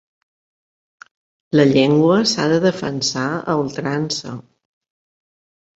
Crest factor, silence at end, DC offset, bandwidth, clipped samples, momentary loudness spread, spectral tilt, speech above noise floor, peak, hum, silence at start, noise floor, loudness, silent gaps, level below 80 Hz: 18 dB; 1.4 s; under 0.1%; 8.2 kHz; under 0.1%; 10 LU; -5 dB/octave; over 73 dB; -2 dBFS; none; 1.55 s; under -90 dBFS; -17 LUFS; none; -58 dBFS